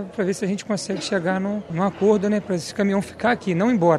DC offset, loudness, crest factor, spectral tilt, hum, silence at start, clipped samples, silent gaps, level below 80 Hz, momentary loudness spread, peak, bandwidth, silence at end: under 0.1%; -22 LUFS; 16 dB; -6 dB/octave; none; 0 s; under 0.1%; none; -58 dBFS; 7 LU; -4 dBFS; 12.5 kHz; 0 s